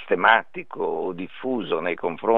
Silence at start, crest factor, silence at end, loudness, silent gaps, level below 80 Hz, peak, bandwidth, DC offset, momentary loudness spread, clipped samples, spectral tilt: 0 s; 22 dB; 0 s; -24 LUFS; none; -70 dBFS; -2 dBFS; 4.2 kHz; 0.8%; 13 LU; under 0.1%; -7.5 dB/octave